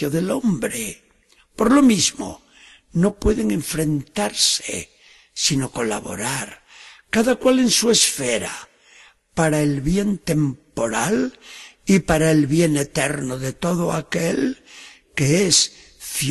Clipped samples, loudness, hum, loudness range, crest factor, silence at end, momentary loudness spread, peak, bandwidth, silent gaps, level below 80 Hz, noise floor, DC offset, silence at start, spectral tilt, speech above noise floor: under 0.1%; -20 LUFS; none; 3 LU; 18 dB; 0 s; 15 LU; -2 dBFS; 13 kHz; none; -42 dBFS; -57 dBFS; under 0.1%; 0 s; -4 dB/octave; 38 dB